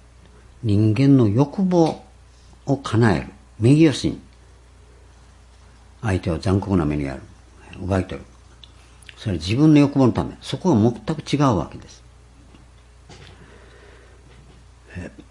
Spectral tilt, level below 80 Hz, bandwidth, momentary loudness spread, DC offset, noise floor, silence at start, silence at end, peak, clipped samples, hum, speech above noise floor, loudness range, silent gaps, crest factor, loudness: -7.5 dB/octave; -46 dBFS; 11 kHz; 20 LU; under 0.1%; -48 dBFS; 0.65 s; 0.1 s; -2 dBFS; under 0.1%; none; 29 dB; 6 LU; none; 18 dB; -20 LUFS